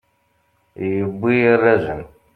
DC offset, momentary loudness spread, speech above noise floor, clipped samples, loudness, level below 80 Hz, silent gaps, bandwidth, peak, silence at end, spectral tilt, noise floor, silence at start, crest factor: under 0.1%; 14 LU; 47 dB; under 0.1%; -18 LUFS; -52 dBFS; none; 4.7 kHz; -2 dBFS; 0.3 s; -9 dB/octave; -64 dBFS; 0.8 s; 18 dB